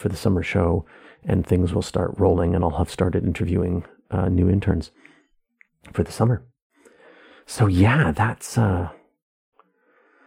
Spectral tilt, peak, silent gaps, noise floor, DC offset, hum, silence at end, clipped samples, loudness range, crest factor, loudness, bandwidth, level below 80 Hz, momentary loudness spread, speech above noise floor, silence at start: -7.5 dB/octave; -4 dBFS; 6.62-6.70 s; -61 dBFS; under 0.1%; none; 1.35 s; under 0.1%; 3 LU; 18 dB; -22 LUFS; 15 kHz; -40 dBFS; 10 LU; 41 dB; 0 s